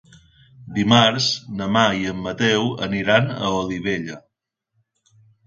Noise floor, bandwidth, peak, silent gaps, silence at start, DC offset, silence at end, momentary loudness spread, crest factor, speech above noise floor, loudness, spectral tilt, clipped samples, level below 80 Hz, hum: -77 dBFS; 7.8 kHz; 0 dBFS; none; 0.6 s; under 0.1%; 1.25 s; 12 LU; 22 dB; 58 dB; -20 LUFS; -4.5 dB/octave; under 0.1%; -52 dBFS; none